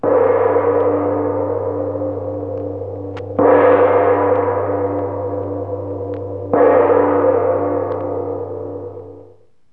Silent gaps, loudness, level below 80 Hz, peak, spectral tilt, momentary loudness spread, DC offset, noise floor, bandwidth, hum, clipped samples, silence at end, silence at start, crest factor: none; -17 LUFS; -58 dBFS; 0 dBFS; -10.5 dB/octave; 14 LU; 0.4%; -47 dBFS; 3.7 kHz; none; under 0.1%; 0.45 s; 0 s; 16 dB